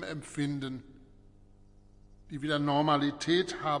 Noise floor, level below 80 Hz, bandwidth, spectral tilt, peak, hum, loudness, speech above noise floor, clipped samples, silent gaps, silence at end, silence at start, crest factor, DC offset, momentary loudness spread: -57 dBFS; -60 dBFS; 11 kHz; -5.5 dB/octave; -14 dBFS; 50 Hz at -55 dBFS; -31 LUFS; 27 dB; under 0.1%; none; 0 s; 0 s; 18 dB; under 0.1%; 13 LU